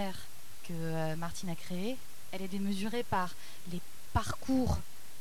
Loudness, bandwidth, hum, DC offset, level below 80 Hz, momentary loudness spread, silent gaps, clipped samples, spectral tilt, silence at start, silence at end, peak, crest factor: -37 LUFS; 19 kHz; none; 2%; -50 dBFS; 14 LU; none; under 0.1%; -5.5 dB/octave; 0 s; 0 s; -16 dBFS; 20 dB